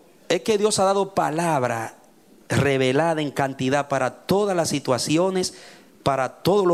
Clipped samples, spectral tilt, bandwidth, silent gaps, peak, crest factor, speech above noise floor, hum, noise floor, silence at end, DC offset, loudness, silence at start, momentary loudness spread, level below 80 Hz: under 0.1%; -4.5 dB/octave; 15.5 kHz; none; -8 dBFS; 14 dB; 31 dB; none; -53 dBFS; 0 s; under 0.1%; -22 LUFS; 0.3 s; 6 LU; -60 dBFS